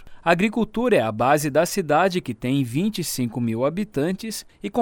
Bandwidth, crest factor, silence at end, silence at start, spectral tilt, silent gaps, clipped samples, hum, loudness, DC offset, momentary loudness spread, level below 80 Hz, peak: 19 kHz; 20 dB; 0 s; 0 s; -5.5 dB/octave; none; under 0.1%; none; -22 LUFS; under 0.1%; 7 LU; -50 dBFS; -2 dBFS